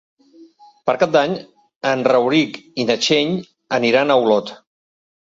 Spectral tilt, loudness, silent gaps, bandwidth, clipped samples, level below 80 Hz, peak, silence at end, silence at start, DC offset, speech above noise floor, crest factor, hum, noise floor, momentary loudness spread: -4.5 dB/octave; -18 LUFS; 1.76-1.81 s; 7.8 kHz; under 0.1%; -64 dBFS; -2 dBFS; 0.65 s; 0.4 s; under 0.1%; 30 dB; 16 dB; none; -47 dBFS; 10 LU